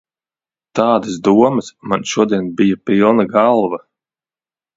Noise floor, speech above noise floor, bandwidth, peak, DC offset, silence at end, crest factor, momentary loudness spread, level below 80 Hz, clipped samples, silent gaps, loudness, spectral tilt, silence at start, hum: under -90 dBFS; over 76 dB; 7.8 kHz; 0 dBFS; under 0.1%; 1 s; 16 dB; 9 LU; -56 dBFS; under 0.1%; none; -15 LUFS; -6 dB/octave; 0.75 s; none